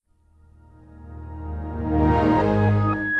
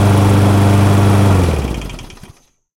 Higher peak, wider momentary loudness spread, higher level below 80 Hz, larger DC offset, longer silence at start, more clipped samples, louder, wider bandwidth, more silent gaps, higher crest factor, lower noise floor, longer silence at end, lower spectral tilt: second, -8 dBFS vs 0 dBFS; first, 20 LU vs 15 LU; second, -34 dBFS vs -26 dBFS; neither; first, 0.9 s vs 0 s; neither; second, -21 LUFS vs -12 LUFS; second, 6.2 kHz vs 15.5 kHz; neither; about the same, 14 dB vs 12 dB; first, -56 dBFS vs -45 dBFS; second, 0 s vs 0.75 s; first, -9.5 dB/octave vs -7 dB/octave